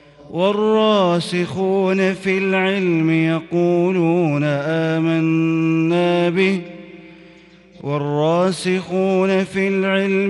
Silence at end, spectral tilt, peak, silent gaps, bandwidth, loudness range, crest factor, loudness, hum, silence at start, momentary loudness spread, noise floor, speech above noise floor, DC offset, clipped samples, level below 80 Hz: 0 s; -7 dB/octave; -4 dBFS; none; 11.5 kHz; 3 LU; 14 dB; -18 LUFS; none; 0.25 s; 5 LU; -46 dBFS; 29 dB; under 0.1%; under 0.1%; -60 dBFS